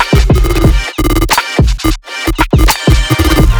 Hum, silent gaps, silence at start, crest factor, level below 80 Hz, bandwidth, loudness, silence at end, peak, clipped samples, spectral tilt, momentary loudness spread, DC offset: none; none; 0 s; 8 dB; -12 dBFS; over 20 kHz; -11 LUFS; 0 s; 0 dBFS; 0.9%; -5 dB/octave; 6 LU; under 0.1%